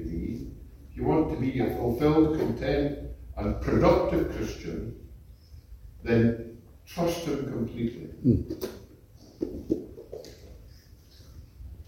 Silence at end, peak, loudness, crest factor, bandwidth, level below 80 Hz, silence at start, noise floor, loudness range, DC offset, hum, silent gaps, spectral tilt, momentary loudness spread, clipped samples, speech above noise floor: 0.05 s; -8 dBFS; -28 LUFS; 20 dB; 16.5 kHz; -42 dBFS; 0 s; -52 dBFS; 7 LU; under 0.1%; none; none; -7.5 dB/octave; 21 LU; under 0.1%; 26 dB